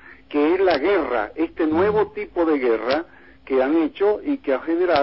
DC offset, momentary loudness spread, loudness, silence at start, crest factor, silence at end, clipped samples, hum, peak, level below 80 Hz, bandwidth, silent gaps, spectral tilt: 0.2%; 6 LU; -21 LUFS; 0.05 s; 14 dB; 0 s; under 0.1%; none; -6 dBFS; -52 dBFS; 5.8 kHz; none; -9.5 dB/octave